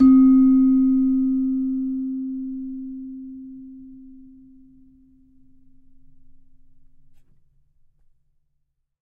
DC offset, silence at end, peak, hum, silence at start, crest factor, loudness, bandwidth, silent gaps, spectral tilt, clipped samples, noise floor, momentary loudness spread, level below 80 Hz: under 0.1%; 4.95 s; -6 dBFS; none; 0 s; 16 dB; -19 LUFS; 2.3 kHz; none; -10 dB/octave; under 0.1%; -71 dBFS; 25 LU; -48 dBFS